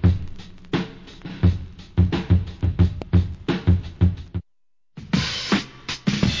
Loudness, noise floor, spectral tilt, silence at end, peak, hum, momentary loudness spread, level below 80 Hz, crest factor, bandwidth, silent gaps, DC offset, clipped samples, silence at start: -23 LUFS; -80 dBFS; -6.5 dB/octave; 0 s; -6 dBFS; none; 14 LU; -28 dBFS; 16 dB; 7.6 kHz; none; 0.1%; under 0.1%; 0 s